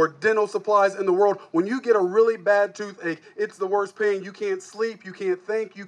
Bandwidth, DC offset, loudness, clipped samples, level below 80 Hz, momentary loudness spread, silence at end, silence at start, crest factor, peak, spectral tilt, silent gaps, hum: 10 kHz; under 0.1%; -23 LUFS; under 0.1%; -86 dBFS; 10 LU; 0 s; 0 s; 16 dB; -6 dBFS; -5.5 dB/octave; none; none